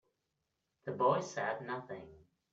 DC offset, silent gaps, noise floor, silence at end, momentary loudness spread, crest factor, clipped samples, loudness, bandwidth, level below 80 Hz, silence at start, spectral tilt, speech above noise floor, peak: under 0.1%; none; -85 dBFS; 0.35 s; 17 LU; 20 dB; under 0.1%; -36 LUFS; 7.8 kHz; -76 dBFS; 0.85 s; -5.5 dB/octave; 49 dB; -20 dBFS